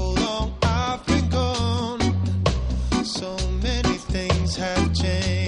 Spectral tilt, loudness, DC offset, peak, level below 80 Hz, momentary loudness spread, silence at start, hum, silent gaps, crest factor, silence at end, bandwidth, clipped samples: -5.5 dB/octave; -23 LUFS; under 0.1%; -6 dBFS; -28 dBFS; 3 LU; 0 s; none; none; 16 dB; 0 s; 11 kHz; under 0.1%